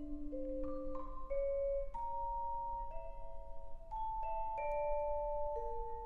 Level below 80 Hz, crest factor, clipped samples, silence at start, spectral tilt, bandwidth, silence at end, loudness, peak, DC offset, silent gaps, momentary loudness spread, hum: -48 dBFS; 14 dB; under 0.1%; 0 s; -9 dB/octave; 3.4 kHz; 0 s; -42 LUFS; -26 dBFS; under 0.1%; none; 13 LU; none